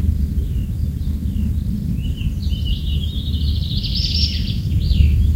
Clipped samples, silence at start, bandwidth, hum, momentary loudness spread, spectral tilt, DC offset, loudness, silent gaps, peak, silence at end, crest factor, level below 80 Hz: under 0.1%; 0 s; 15.5 kHz; none; 6 LU; -6.5 dB/octave; under 0.1%; -21 LUFS; none; 0 dBFS; 0 s; 18 dB; -20 dBFS